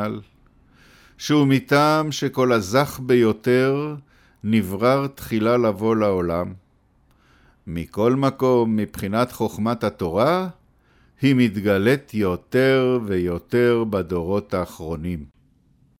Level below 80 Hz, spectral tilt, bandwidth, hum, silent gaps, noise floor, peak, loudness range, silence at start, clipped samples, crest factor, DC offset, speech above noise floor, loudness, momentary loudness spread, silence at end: -50 dBFS; -6.5 dB/octave; 17 kHz; none; none; -59 dBFS; -4 dBFS; 4 LU; 0 s; under 0.1%; 16 dB; under 0.1%; 39 dB; -21 LUFS; 12 LU; 0.75 s